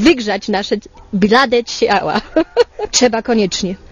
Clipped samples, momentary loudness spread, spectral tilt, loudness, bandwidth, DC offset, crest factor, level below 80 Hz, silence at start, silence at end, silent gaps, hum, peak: under 0.1%; 8 LU; -3.5 dB/octave; -15 LUFS; 10.5 kHz; under 0.1%; 14 dB; -42 dBFS; 0 s; 0.15 s; none; none; 0 dBFS